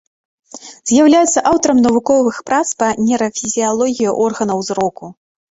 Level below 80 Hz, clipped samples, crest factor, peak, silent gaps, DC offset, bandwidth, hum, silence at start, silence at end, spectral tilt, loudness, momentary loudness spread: -52 dBFS; under 0.1%; 14 dB; -2 dBFS; none; under 0.1%; 8 kHz; none; 0.55 s; 0.4 s; -4 dB/octave; -14 LUFS; 10 LU